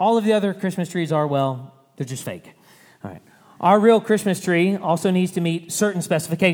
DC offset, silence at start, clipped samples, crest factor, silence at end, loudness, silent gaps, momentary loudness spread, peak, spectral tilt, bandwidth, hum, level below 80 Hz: under 0.1%; 0 s; under 0.1%; 18 dB; 0 s; -20 LUFS; none; 18 LU; -2 dBFS; -5.5 dB/octave; 19.5 kHz; none; -68 dBFS